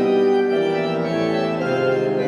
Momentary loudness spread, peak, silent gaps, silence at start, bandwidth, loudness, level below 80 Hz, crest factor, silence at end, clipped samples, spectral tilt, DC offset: 4 LU; -8 dBFS; none; 0 s; 10 kHz; -20 LUFS; -62 dBFS; 12 dB; 0 s; under 0.1%; -7 dB/octave; under 0.1%